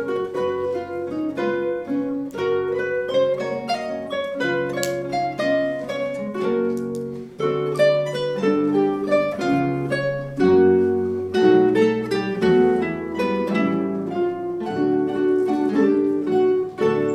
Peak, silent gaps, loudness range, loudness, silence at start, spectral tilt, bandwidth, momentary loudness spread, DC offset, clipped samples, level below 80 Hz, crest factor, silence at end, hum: -4 dBFS; none; 5 LU; -21 LUFS; 0 s; -6.5 dB/octave; 13.5 kHz; 9 LU; under 0.1%; under 0.1%; -58 dBFS; 16 dB; 0 s; none